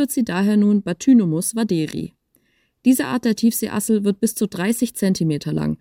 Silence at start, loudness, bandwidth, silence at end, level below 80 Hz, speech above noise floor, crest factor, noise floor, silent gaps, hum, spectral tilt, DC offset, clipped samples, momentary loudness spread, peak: 0 s; -19 LUFS; 17 kHz; 0.05 s; -56 dBFS; 44 dB; 14 dB; -63 dBFS; none; none; -5.5 dB/octave; under 0.1%; under 0.1%; 7 LU; -6 dBFS